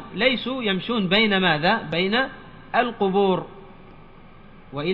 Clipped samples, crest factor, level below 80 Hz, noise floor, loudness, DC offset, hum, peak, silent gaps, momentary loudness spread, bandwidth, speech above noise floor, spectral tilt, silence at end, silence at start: under 0.1%; 18 dB; -50 dBFS; -45 dBFS; -21 LUFS; under 0.1%; none; -4 dBFS; none; 11 LU; 7.4 kHz; 24 dB; -7.5 dB/octave; 0 s; 0 s